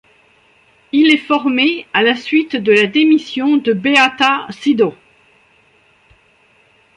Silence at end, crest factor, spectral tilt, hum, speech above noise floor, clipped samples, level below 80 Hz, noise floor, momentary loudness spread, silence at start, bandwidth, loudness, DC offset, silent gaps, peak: 2.05 s; 16 dB; -4.5 dB/octave; none; 40 dB; under 0.1%; -62 dBFS; -53 dBFS; 5 LU; 0.95 s; 10.5 kHz; -13 LUFS; under 0.1%; none; 0 dBFS